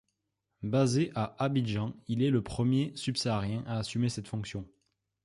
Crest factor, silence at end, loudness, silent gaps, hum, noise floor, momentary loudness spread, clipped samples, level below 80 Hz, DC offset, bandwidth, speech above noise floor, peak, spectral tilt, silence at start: 16 dB; 0.6 s; -31 LUFS; none; none; -83 dBFS; 9 LU; under 0.1%; -58 dBFS; under 0.1%; 11.5 kHz; 53 dB; -16 dBFS; -6.5 dB/octave; 0.6 s